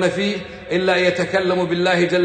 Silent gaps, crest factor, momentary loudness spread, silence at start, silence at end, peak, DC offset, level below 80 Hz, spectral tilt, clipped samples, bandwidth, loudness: none; 14 dB; 7 LU; 0 s; 0 s; -4 dBFS; under 0.1%; -52 dBFS; -5.5 dB/octave; under 0.1%; 9.2 kHz; -19 LUFS